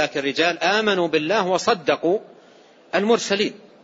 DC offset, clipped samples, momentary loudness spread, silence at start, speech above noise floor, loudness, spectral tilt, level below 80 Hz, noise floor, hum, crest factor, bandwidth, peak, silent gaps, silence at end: under 0.1%; under 0.1%; 5 LU; 0 s; 30 dB; -21 LUFS; -3.5 dB/octave; -70 dBFS; -50 dBFS; none; 18 dB; 8 kHz; -4 dBFS; none; 0.25 s